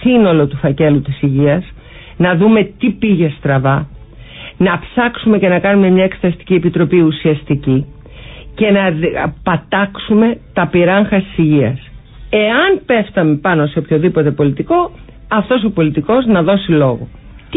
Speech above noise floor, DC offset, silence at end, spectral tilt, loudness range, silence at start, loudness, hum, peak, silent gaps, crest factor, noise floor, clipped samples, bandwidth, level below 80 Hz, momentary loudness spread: 21 dB; under 0.1%; 0 s; -13 dB/octave; 2 LU; 0 s; -13 LUFS; none; 0 dBFS; none; 12 dB; -33 dBFS; under 0.1%; 4 kHz; -38 dBFS; 7 LU